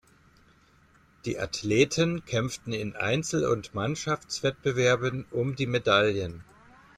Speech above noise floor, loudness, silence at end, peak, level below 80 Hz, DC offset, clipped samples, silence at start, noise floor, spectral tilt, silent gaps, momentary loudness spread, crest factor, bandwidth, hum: 33 dB; -27 LUFS; 0.55 s; -8 dBFS; -58 dBFS; under 0.1%; under 0.1%; 1.25 s; -60 dBFS; -4.5 dB/octave; none; 10 LU; 20 dB; 15 kHz; none